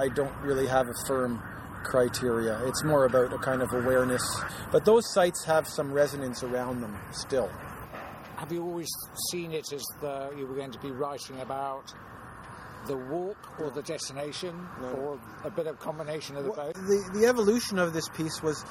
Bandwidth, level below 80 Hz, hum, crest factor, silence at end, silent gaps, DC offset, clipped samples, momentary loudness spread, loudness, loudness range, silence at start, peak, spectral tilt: 16.5 kHz; -56 dBFS; none; 20 dB; 0 s; none; under 0.1%; under 0.1%; 14 LU; -30 LUFS; 11 LU; 0 s; -10 dBFS; -4.5 dB/octave